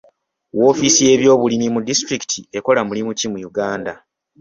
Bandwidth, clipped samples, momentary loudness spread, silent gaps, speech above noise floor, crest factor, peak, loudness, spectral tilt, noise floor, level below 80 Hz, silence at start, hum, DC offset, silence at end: 7.8 kHz; under 0.1%; 11 LU; none; 36 dB; 16 dB; 0 dBFS; -16 LUFS; -3 dB/octave; -52 dBFS; -56 dBFS; 0.55 s; none; under 0.1%; 0.45 s